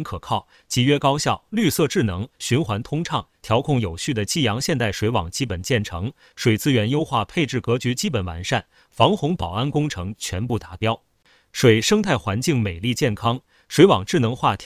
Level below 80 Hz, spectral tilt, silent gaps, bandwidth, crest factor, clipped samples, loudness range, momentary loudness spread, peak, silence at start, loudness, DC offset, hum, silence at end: -42 dBFS; -5 dB/octave; none; 16 kHz; 20 dB; under 0.1%; 3 LU; 9 LU; 0 dBFS; 0 s; -21 LUFS; under 0.1%; none; 0 s